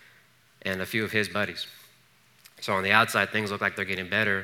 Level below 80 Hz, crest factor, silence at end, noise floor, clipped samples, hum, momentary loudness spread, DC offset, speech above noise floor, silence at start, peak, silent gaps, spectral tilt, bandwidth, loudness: -76 dBFS; 24 dB; 0 s; -61 dBFS; under 0.1%; none; 15 LU; under 0.1%; 34 dB; 0.65 s; -4 dBFS; none; -4 dB/octave; 18.5 kHz; -26 LUFS